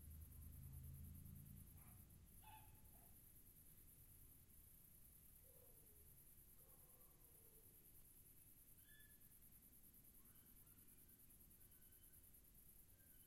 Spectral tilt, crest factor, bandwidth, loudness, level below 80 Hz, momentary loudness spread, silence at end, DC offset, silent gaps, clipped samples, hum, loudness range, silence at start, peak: -4.5 dB/octave; 18 dB; 16 kHz; -65 LUFS; -70 dBFS; 6 LU; 0 s; under 0.1%; none; under 0.1%; none; 4 LU; 0 s; -48 dBFS